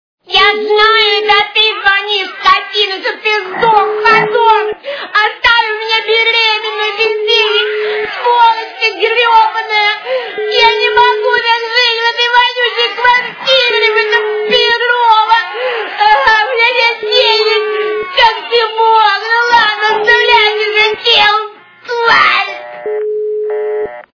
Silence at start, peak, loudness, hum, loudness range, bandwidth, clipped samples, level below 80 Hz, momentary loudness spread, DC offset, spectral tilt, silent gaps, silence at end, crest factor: 0.3 s; 0 dBFS; -10 LUFS; none; 2 LU; 5.4 kHz; 0.4%; -50 dBFS; 8 LU; under 0.1%; -1.5 dB/octave; none; 0.15 s; 10 dB